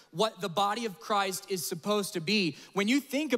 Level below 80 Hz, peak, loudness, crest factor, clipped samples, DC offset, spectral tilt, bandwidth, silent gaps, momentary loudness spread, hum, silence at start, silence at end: -80 dBFS; -14 dBFS; -30 LUFS; 16 dB; under 0.1%; under 0.1%; -3.5 dB/octave; 16 kHz; none; 5 LU; none; 0.15 s; 0 s